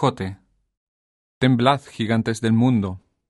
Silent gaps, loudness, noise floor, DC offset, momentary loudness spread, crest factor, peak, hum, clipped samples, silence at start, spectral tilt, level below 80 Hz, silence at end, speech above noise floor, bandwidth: 0.77-1.41 s; -20 LUFS; under -90 dBFS; under 0.1%; 12 LU; 18 dB; -2 dBFS; none; under 0.1%; 0 s; -6.5 dB/octave; -56 dBFS; 0.3 s; over 70 dB; 11.5 kHz